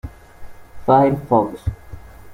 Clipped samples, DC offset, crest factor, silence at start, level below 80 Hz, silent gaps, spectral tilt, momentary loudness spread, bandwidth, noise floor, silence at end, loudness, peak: under 0.1%; under 0.1%; 18 dB; 0.05 s; -38 dBFS; none; -9 dB/octave; 21 LU; 16.5 kHz; -37 dBFS; 0 s; -18 LUFS; -2 dBFS